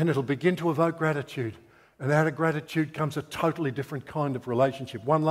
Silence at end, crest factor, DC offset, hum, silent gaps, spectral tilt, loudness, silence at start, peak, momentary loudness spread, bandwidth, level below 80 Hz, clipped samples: 0 s; 20 dB; under 0.1%; none; none; -7 dB/octave; -28 LUFS; 0 s; -8 dBFS; 9 LU; 15.5 kHz; -66 dBFS; under 0.1%